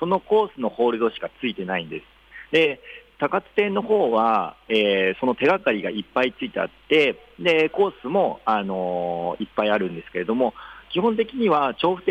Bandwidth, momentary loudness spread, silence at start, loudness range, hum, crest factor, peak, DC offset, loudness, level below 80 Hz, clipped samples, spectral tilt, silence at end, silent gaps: 8.6 kHz; 9 LU; 0 s; 3 LU; none; 14 dB; -8 dBFS; under 0.1%; -22 LUFS; -58 dBFS; under 0.1%; -6.5 dB/octave; 0 s; none